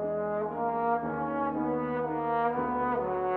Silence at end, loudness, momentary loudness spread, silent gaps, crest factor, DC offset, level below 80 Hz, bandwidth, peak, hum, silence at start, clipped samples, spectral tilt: 0 s; -30 LUFS; 3 LU; none; 14 dB; under 0.1%; -60 dBFS; 4.4 kHz; -16 dBFS; none; 0 s; under 0.1%; -10 dB/octave